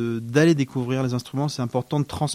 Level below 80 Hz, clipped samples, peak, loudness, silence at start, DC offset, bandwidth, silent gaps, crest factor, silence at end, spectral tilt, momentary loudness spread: -54 dBFS; under 0.1%; -6 dBFS; -23 LUFS; 0 s; under 0.1%; 15 kHz; none; 16 dB; 0 s; -6 dB/octave; 8 LU